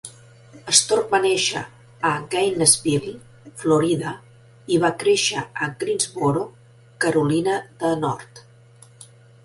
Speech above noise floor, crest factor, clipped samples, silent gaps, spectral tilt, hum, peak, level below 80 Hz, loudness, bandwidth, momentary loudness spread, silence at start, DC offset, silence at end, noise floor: 28 dB; 22 dB; under 0.1%; none; -3 dB/octave; none; 0 dBFS; -58 dBFS; -20 LUFS; 12 kHz; 16 LU; 0.05 s; under 0.1%; 0.4 s; -49 dBFS